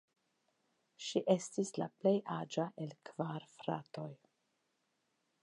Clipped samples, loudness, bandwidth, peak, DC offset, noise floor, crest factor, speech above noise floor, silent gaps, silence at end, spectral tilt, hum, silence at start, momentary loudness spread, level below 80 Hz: under 0.1%; -39 LUFS; 11 kHz; -16 dBFS; under 0.1%; -82 dBFS; 24 dB; 44 dB; none; 1.3 s; -5.5 dB/octave; none; 1 s; 13 LU; -88 dBFS